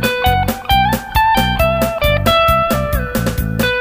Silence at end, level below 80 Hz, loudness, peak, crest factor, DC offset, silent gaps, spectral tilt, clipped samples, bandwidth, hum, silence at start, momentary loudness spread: 0 s; -24 dBFS; -14 LUFS; 0 dBFS; 14 dB; under 0.1%; none; -5 dB/octave; under 0.1%; 16 kHz; none; 0 s; 6 LU